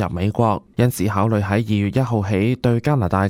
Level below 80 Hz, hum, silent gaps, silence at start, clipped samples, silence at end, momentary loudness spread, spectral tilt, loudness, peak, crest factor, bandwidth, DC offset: -44 dBFS; none; none; 0 s; under 0.1%; 0 s; 2 LU; -7.5 dB/octave; -19 LUFS; -4 dBFS; 16 dB; 16 kHz; under 0.1%